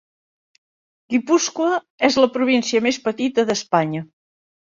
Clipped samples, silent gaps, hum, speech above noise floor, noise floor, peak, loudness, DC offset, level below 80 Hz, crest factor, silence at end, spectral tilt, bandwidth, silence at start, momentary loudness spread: under 0.1%; 1.90-1.98 s; none; over 71 dB; under -90 dBFS; -2 dBFS; -19 LUFS; under 0.1%; -64 dBFS; 18 dB; 0.65 s; -4 dB/octave; 7.6 kHz; 1.1 s; 7 LU